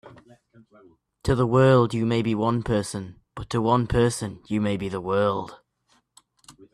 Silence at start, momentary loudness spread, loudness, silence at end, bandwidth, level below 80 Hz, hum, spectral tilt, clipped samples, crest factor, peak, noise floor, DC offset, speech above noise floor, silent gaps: 0.05 s; 14 LU; -23 LUFS; 0.25 s; 13 kHz; -46 dBFS; none; -6.5 dB/octave; under 0.1%; 18 dB; -6 dBFS; -67 dBFS; under 0.1%; 44 dB; none